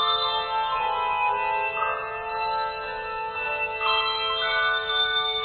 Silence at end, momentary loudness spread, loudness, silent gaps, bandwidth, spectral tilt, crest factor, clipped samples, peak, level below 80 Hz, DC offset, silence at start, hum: 0 s; 7 LU; -25 LUFS; none; 4.7 kHz; -4.5 dB/octave; 14 dB; under 0.1%; -12 dBFS; -54 dBFS; under 0.1%; 0 s; none